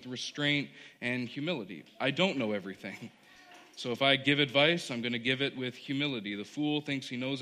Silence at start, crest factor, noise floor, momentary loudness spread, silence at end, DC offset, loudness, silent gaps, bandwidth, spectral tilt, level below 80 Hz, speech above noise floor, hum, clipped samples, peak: 0 s; 22 dB; -56 dBFS; 16 LU; 0 s; under 0.1%; -31 LUFS; none; 13.5 kHz; -4.5 dB/octave; -74 dBFS; 23 dB; none; under 0.1%; -12 dBFS